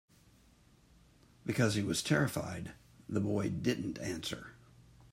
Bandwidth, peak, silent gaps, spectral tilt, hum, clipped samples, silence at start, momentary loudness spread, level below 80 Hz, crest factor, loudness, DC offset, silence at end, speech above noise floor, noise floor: 16 kHz; -16 dBFS; none; -5 dB/octave; none; under 0.1%; 1.45 s; 14 LU; -64 dBFS; 20 dB; -35 LUFS; under 0.1%; 0.3 s; 30 dB; -64 dBFS